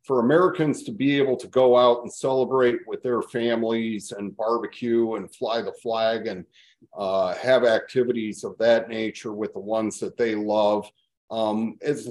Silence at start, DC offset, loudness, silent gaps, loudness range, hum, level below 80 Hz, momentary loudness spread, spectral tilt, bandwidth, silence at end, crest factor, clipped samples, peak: 0.1 s; under 0.1%; -24 LUFS; 11.17-11.28 s; 5 LU; none; -72 dBFS; 11 LU; -5.5 dB/octave; 12 kHz; 0 s; 18 dB; under 0.1%; -6 dBFS